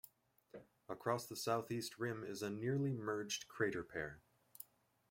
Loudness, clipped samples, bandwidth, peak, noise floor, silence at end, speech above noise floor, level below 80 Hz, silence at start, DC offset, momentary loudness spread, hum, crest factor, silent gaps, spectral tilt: -42 LUFS; under 0.1%; 16.5 kHz; -24 dBFS; -67 dBFS; 0.5 s; 25 dB; -76 dBFS; 0.55 s; under 0.1%; 20 LU; none; 20 dB; none; -5 dB/octave